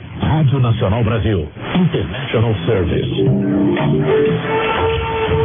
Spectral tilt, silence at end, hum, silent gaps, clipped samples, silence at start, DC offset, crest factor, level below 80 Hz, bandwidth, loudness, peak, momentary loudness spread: -11 dB/octave; 0 s; none; none; under 0.1%; 0 s; under 0.1%; 10 dB; -34 dBFS; 3.7 kHz; -16 LUFS; -6 dBFS; 4 LU